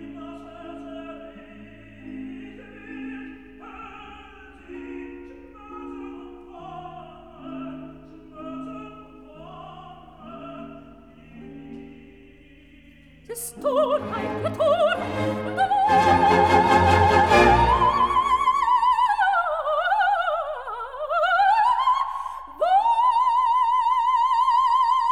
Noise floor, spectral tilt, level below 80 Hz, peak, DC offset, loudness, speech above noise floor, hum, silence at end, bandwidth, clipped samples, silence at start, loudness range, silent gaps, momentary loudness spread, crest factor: -50 dBFS; -5 dB/octave; -44 dBFS; -4 dBFS; 0.1%; -20 LUFS; 27 dB; none; 0 s; 15.5 kHz; under 0.1%; 0 s; 22 LU; none; 24 LU; 20 dB